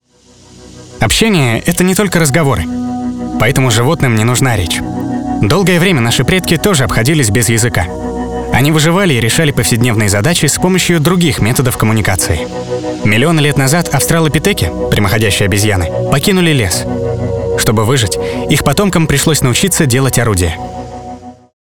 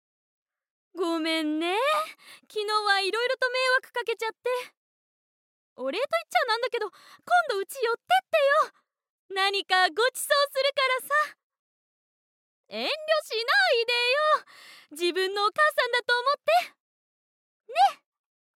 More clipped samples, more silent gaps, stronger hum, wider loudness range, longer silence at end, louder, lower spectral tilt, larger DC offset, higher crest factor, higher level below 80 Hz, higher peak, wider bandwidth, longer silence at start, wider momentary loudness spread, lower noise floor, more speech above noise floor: neither; second, none vs 4.77-5.76 s, 9.10-9.29 s, 11.43-11.50 s, 11.59-12.64 s, 16.80-17.60 s; neither; second, 2 LU vs 5 LU; second, 0.1 s vs 0.6 s; first, -11 LUFS vs -25 LUFS; first, -4.5 dB/octave vs 0 dB/octave; first, 2% vs under 0.1%; second, 12 dB vs 20 dB; first, -30 dBFS vs under -90 dBFS; first, 0 dBFS vs -8 dBFS; first, 20 kHz vs 17 kHz; second, 0 s vs 0.95 s; about the same, 8 LU vs 10 LU; second, -43 dBFS vs under -90 dBFS; second, 33 dB vs over 64 dB